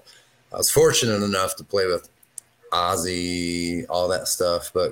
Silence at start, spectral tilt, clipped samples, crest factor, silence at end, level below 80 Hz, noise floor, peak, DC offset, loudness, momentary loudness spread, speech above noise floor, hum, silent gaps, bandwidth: 0.5 s; -3 dB/octave; under 0.1%; 18 dB; 0 s; -52 dBFS; -54 dBFS; -6 dBFS; under 0.1%; -22 LUFS; 17 LU; 31 dB; none; none; 17 kHz